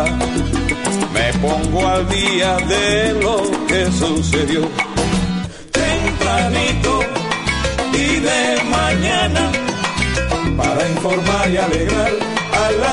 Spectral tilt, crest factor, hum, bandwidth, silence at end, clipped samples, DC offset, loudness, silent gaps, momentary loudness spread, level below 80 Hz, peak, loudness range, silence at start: -4.5 dB/octave; 16 dB; none; 11 kHz; 0 s; under 0.1%; under 0.1%; -16 LUFS; none; 4 LU; -28 dBFS; 0 dBFS; 1 LU; 0 s